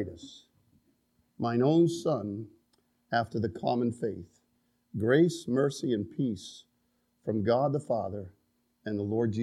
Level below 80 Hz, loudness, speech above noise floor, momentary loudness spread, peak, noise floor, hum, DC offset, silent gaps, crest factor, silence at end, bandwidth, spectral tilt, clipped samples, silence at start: -68 dBFS; -30 LUFS; 45 dB; 18 LU; -12 dBFS; -74 dBFS; none; under 0.1%; none; 20 dB; 0 s; 12 kHz; -7 dB/octave; under 0.1%; 0 s